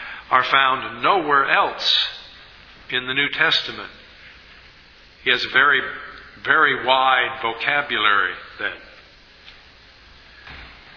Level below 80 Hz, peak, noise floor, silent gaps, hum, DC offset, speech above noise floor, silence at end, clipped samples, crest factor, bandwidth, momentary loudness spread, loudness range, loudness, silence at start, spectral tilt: -54 dBFS; 0 dBFS; -48 dBFS; none; none; under 0.1%; 29 dB; 0.2 s; under 0.1%; 22 dB; 5.4 kHz; 19 LU; 5 LU; -18 LUFS; 0 s; -3 dB/octave